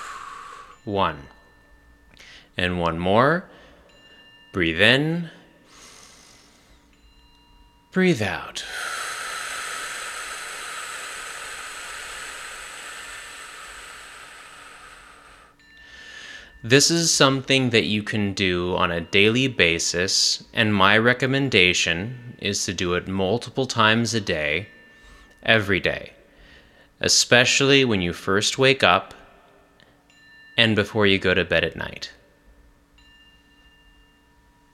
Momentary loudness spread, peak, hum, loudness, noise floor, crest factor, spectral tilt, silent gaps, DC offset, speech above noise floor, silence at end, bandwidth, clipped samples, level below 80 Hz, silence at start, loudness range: 22 LU; 0 dBFS; none; -20 LUFS; -57 dBFS; 24 dB; -3.5 dB/octave; none; under 0.1%; 37 dB; 2.65 s; 15.5 kHz; under 0.1%; -52 dBFS; 0 s; 15 LU